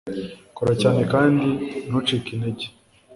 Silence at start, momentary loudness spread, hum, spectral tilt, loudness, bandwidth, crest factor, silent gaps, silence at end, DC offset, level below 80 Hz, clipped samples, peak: 0.05 s; 15 LU; none; -6.5 dB/octave; -22 LUFS; 11.5 kHz; 18 dB; none; 0 s; under 0.1%; -52 dBFS; under 0.1%; -4 dBFS